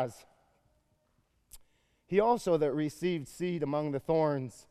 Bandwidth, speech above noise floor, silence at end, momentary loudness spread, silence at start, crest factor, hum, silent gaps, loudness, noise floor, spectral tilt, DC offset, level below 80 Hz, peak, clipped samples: 14.5 kHz; 43 dB; 0.1 s; 8 LU; 0 s; 20 dB; none; none; -31 LUFS; -73 dBFS; -7 dB/octave; under 0.1%; -64 dBFS; -12 dBFS; under 0.1%